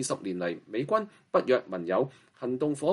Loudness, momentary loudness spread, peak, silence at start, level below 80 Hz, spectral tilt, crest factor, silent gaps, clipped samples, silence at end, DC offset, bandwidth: -30 LUFS; 8 LU; -12 dBFS; 0 s; -76 dBFS; -5 dB/octave; 18 dB; none; under 0.1%; 0 s; under 0.1%; 11.5 kHz